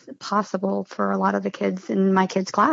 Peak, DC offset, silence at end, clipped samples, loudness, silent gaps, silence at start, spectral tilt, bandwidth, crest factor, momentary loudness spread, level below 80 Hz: -6 dBFS; under 0.1%; 0 s; under 0.1%; -23 LUFS; none; 0.05 s; -6.5 dB/octave; 7.8 kHz; 16 dB; 6 LU; -70 dBFS